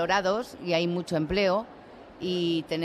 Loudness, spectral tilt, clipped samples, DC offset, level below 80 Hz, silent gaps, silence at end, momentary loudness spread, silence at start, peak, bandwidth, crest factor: -28 LUFS; -5.5 dB/octave; under 0.1%; under 0.1%; -52 dBFS; none; 0 s; 10 LU; 0 s; -12 dBFS; 14 kHz; 16 dB